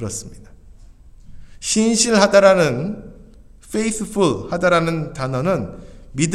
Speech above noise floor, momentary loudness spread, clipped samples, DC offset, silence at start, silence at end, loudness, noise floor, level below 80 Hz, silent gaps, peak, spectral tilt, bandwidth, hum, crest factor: 26 dB; 16 LU; under 0.1%; under 0.1%; 0 s; 0 s; -18 LUFS; -43 dBFS; -42 dBFS; none; 0 dBFS; -4.5 dB/octave; 13.5 kHz; none; 20 dB